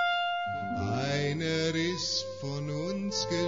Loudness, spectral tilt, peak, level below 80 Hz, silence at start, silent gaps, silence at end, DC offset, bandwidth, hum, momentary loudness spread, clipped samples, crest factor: -31 LUFS; -4.5 dB/octave; -18 dBFS; -62 dBFS; 0 s; none; 0 s; 0.2%; 7.6 kHz; none; 5 LU; under 0.1%; 12 dB